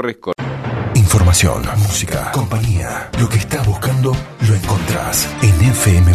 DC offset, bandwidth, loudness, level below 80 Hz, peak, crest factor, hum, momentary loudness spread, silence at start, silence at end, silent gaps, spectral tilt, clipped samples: under 0.1%; 14 kHz; -15 LUFS; -28 dBFS; -2 dBFS; 12 dB; none; 10 LU; 0 s; 0 s; none; -5 dB/octave; under 0.1%